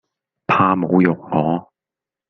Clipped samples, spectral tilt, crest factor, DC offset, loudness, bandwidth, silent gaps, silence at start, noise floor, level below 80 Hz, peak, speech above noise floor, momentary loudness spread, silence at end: under 0.1%; -9 dB/octave; 18 dB; under 0.1%; -17 LUFS; 6.2 kHz; none; 0.5 s; -88 dBFS; -58 dBFS; -2 dBFS; 71 dB; 9 LU; 0.65 s